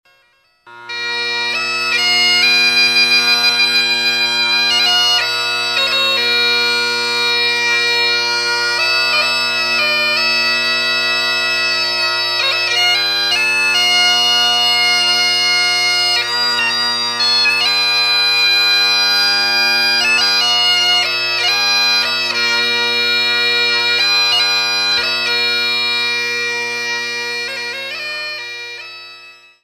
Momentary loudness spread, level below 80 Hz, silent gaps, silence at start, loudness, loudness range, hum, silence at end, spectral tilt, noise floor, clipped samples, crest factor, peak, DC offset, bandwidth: 8 LU; -64 dBFS; none; 0.65 s; -12 LUFS; 3 LU; none; 0.3 s; 0.5 dB/octave; -56 dBFS; under 0.1%; 14 dB; -2 dBFS; under 0.1%; 14 kHz